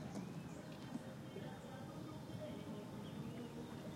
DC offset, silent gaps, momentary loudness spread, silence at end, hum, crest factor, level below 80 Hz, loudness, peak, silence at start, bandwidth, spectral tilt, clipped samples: under 0.1%; none; 2 LU; 0 s; none; 16 dB; -72 dBFS; -50 LUFS; -34 dBFS; 0 s; 16 kHz; -6.5 dB/octave; under 0.1%